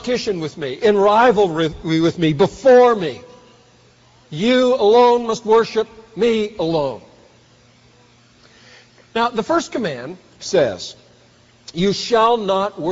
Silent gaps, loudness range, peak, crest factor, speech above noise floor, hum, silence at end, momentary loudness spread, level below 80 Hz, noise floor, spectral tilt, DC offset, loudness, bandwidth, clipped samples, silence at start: none; 9 LU; -4 dBFS; 14 dB; 35 dB; none; 0 s; 16 LU; -52 dBFS; -51 dBFS; -4 dB/octave; under 0.1%; -17 LUFS; 8 kHz; under 0.1%; 0 s